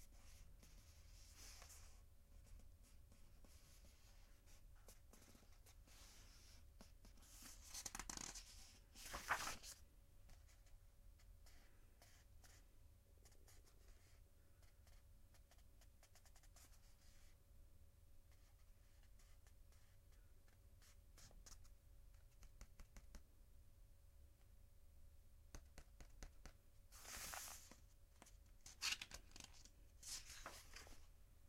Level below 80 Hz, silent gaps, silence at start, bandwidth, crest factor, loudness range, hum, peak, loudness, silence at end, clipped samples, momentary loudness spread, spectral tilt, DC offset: -66 dBFS; none; 0 s; 16 kHz; 30 dB; 17 LU; none; -30 dBFS; -55 LUFS; 0 s; under 0.1%; 18 LU; -1 dB/octave; under 0.1%